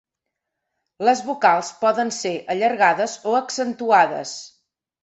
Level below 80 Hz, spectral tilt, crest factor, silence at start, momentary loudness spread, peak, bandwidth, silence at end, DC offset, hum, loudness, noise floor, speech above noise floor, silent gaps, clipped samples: -72 dBFS; -3 dB/octave; 20 dB; 1 s; 9 LU; -2 dBFS; 8.4 kHz; 0.55 s; under 0.1%; none; -20 LUFS; -82 dBFS; 62 dB; none; under 0.1%